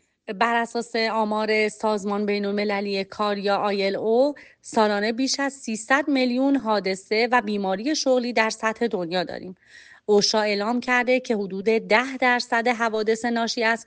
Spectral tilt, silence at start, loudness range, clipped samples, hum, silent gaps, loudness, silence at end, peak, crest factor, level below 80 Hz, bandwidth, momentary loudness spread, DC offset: -3.5 dB/octave; 0.3 s; 2 LU; under 0.1%; none; none; -23 LUFS; 0.05 s; -6 dBFS; 18 dB; -66 dBFS; 9.8 kHz; 6 LU; under 0.1%